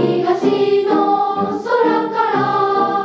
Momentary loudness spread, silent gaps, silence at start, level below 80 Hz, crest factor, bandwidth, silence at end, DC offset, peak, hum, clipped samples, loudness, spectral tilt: 3 LU; none; 0 s; -64 dBFS; 12 dB; 7.8 kHz; 0 s; under 0.1%; -2 dBFS; none; under 0.1%; -16 LUFS; -7 dB/octave